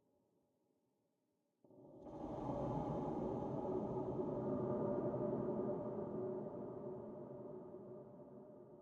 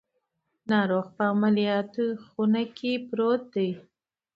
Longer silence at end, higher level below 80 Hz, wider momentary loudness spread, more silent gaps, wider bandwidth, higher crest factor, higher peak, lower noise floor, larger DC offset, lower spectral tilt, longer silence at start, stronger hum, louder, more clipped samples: second, 0 s vs 0.55 s; about the same, -68 dBFS vs -72 dBFS; first, 15 LU vs 7 LU; neither; first, 7 kHz vs 5.4 kHz; about the same, 16 dB vs 18 dB; second, -28 dBFS vs -10 dBFS; first, -85 dBFS vs -78 dBFS; neither; first, -10.5 dB/octave vs -8 dB/octave; first, 1.7 s vs 0.65 s; neither; second, -44 LUFS vs -26 LUFS; neither